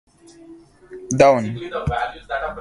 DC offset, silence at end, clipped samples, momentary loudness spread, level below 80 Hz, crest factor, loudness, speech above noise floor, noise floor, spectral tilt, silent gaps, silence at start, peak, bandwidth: under 0.1%; 0 s; under 0.1%; 12 LU; -42 dBFS; 20 dB; -20 LUFS; 26 dB; -45 dBFS; -5.5 dB/octave; none; 0.5 s; 0 dBFS; 11.5 kHz